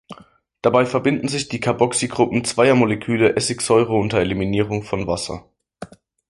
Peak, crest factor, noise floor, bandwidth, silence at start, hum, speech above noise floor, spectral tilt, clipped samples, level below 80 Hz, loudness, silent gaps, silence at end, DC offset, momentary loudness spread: -2 dBFS; 18 dB; -50 dBFS; 11.5 kHz; 0.1 s; none; 31 dB; -5 dB/octave; under 0.1%; -46 dBFS; -19 LUFS; none; 0.45 s; under 0.1%; 12 LU